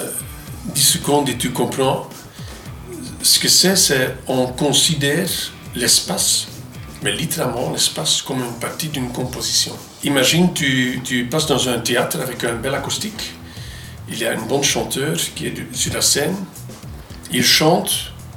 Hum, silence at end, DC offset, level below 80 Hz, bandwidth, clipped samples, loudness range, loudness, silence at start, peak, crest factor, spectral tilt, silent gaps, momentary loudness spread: none; 0 s; under 0.1%; -44 dBFS; 19.5 kHz; under 0.1%; 6 LU; -17 LUFS; 0 s; -2 dBFS; 18 dB; -2.5 dB/octave; none; 20 LU